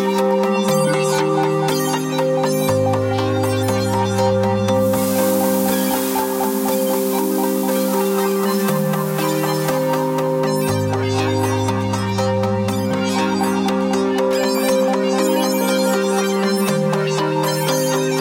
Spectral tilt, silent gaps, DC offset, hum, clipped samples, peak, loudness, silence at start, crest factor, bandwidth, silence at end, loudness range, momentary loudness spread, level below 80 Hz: -5 dB/octave; none; under 0.1%; none; under 0.1%; -4 dBFS; -18 LUFS; 0 s; 12 dB; 17 kHz; 0 s; 1 LU; 2 LU; -54 dBFS